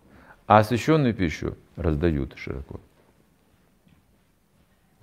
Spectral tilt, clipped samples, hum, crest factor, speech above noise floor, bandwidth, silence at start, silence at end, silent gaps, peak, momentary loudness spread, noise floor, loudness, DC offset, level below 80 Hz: -7 dB/octave; under 0.1%; none; 26 dB; 40 dB; 15.5 kHz; 0.5 s; 2.25 s; none; 0 dBFS; 17 LU; -64 dBFS; -24 LUFS; under 0.1%; -44 dBFS